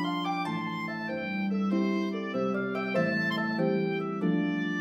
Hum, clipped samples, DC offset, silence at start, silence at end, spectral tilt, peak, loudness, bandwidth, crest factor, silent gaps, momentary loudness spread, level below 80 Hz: none; under 0.1%; under 0.1%; 0 s; 0 s; -7 dB/octave; -14 dBFS; -30 LUFS; 9.4 kHz; 14 dB; none; 5 LU; -78 dBFS